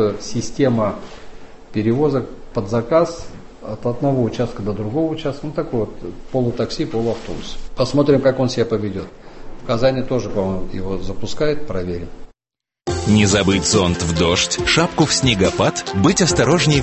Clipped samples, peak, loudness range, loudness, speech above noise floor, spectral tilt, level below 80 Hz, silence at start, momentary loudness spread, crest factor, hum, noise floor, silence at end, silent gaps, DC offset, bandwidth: under 0.1%; -2 dBFS; 7 LU; -18 LUFS; 69 dB; -4.5 dB/octave; -36 dBFS; 0 s; 14 LU; 16 dB; none; -87 dBFS; 0 s; none; under 0.1%; 8.6 kHz